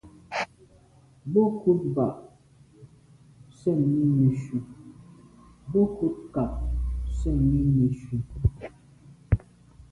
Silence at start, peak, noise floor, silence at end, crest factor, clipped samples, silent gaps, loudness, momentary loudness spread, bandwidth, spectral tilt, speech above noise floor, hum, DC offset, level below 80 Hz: 0.05 s; -8 dBFS; -56 dBFS; 0.55 s; 18 dB; under 0.1%; none; -26 LUFS; 13 LU; 10.5 kHz; -9.5 dB/octave; 32 dB; none; under 0.1%; -36 dBFS